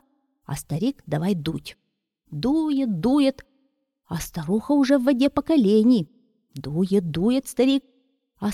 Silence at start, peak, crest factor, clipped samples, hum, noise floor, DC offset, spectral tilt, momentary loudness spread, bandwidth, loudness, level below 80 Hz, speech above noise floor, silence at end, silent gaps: 0.5 s; -6 dBFS; 16 dB; under 0.1%; none; -70 dBFS; under 0.1%; -6.5 dB/octave; 16 LU; 15 kHz; -22 LUFS; -52 dBFS; 49 dB; 0 s; none